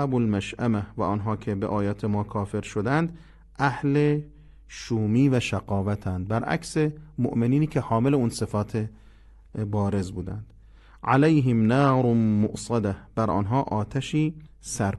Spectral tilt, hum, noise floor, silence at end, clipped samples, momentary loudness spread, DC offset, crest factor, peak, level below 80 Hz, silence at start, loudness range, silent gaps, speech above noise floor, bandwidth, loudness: -7 dB/octave; none; -50 dBFS; 0 s; under 0.1%; 10 LU; under 0.1%; 18 dB; -8 dBFS; -46 dBFS; 0 s; 4 LU; none; 26 dB; 12 kHz; -25 LUFS